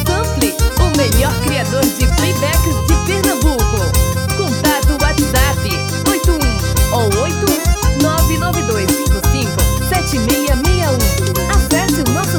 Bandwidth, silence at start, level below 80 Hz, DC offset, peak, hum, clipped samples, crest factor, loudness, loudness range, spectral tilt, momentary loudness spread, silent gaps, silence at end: over 20 kHz; 0 s; -18 dBFS; under 0.1%; 0 dBFS; none; under 0.1%; 14 dB; -14 LUFS; 0 LU; -4.5 dB/octave; 2 LU; none; 0 s